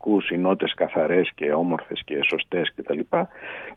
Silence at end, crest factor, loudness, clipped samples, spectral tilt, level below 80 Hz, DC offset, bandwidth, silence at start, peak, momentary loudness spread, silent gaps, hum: 0 s; 16 dB; -24 LUFS; under 0.1%; -7.5 dB/octave; -64 dBFS; under 0.1%; 5.2 kHz; 0.05 s; -8 dBFS; 8 LU; none; none